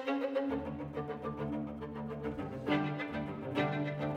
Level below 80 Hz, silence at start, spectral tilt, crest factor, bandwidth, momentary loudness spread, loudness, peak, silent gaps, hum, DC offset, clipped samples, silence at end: -58 dBFS; 0 s; -8 dB/octave; 16 dB; 8.4 kHz; 7 LU; -37 LUFS; -20 dBFS; none; none; under 0.1%; under 0.1%; 0 s